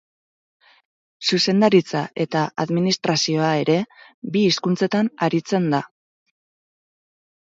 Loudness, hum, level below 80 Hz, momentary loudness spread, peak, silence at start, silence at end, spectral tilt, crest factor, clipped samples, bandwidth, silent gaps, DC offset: -20 LUFS; none; -68 dBFS; 8 LU; -4 dBFS; 1.2 s; 1.6 s; -5 dB/octave; 18 dB; under 0.1%; 7.8 kHz; 4.14-4.22 s; under 0.1%